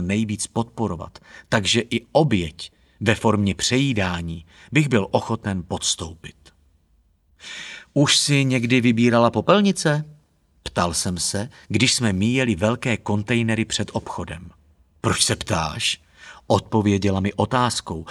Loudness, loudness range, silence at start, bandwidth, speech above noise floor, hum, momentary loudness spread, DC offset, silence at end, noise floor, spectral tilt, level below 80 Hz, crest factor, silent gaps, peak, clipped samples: -21 LUFS; 5 LU; 0 s; 13.5 kHz; 40 dB; none; 16 LU; under 0.1%; 0 s; -61 dBFS; -4.5 dB/octave; -48 dBFS; 20 dB; none; -2 dBFS; under 0.1%